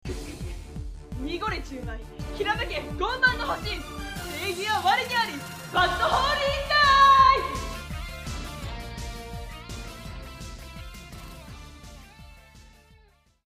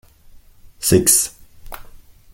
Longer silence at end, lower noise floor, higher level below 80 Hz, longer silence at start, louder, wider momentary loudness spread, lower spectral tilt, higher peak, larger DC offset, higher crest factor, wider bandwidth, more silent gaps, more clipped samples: first, 0.75 s vs 0.5 s; first, -59 dBFS vs -45 dBFS; about the same, -40 dBFS vs -42 dBFS; second, 0.05 s vs 0.35 s; second, -24 LUFS vs -15 LUFS; second, 22 LU vs 26 LU; about the same, -3.5 dB/octave vs -3.5 dB/octave; second, -8 dBFS vs 0 dBFS; neither; about the same, 20 dB vs 22 dB; about the same, 15.5 kHz vs 17 kHz; neither; neither